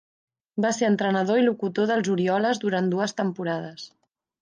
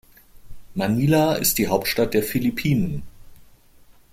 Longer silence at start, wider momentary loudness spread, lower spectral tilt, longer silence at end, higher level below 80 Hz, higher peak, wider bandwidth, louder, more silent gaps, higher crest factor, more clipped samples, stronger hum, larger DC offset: first, 0.55 s vs 0.35 s; about the same, 11 LU vs 9 LU; about the same, -5.5 dB/octave vs -5 dB/octave; second, 0.55 s vs 0.7 s; second, -72 dBFS vs -46 dBFS; second, -10 dBFS vs -4 dBFS; second, 10 kHz vs 16.5 kHz; second, -24 LUFS vs -21 LUFS; neither; about the same, 14 dB vs 18 dB; neither; neither; neither